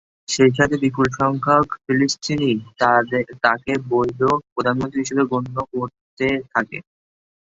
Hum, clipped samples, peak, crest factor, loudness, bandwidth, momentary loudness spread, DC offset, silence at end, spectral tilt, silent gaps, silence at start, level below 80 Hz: none; under 0.1%; 0 dBFS; 20 dB; -20 LUFS; 8 kHz; 9 LU; under 0.1%; 0.75 s; -5 dB/octave; 4.52-4.56 s, 6.01-6.17 s; 0.3 s; -50 dBFS